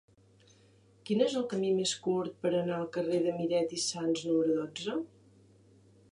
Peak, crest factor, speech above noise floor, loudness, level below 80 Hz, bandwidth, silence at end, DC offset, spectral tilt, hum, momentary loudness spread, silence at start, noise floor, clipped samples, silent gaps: -14 dBFS; 18 dB; 31 dB; -32 LUFS; -78 dBFS; 11.5 kHz; 1.05 s; under 0.1%; -4.5 dB/octave; none; 7 LU; 1.05 s; -62 dBFS; under 0.1%; none